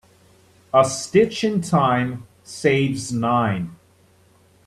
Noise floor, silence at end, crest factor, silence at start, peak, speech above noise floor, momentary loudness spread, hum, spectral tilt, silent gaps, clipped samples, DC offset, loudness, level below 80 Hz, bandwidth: -55 dBFS; 0.9 s; 20 dB; 0.75 s; -2 dBFS; 36 dB; 10 LU; none; -5.5 dB/octave; none; under 0.1%; under 0.1%; -20 LUFS; -56 dBFS; 13.5 kHz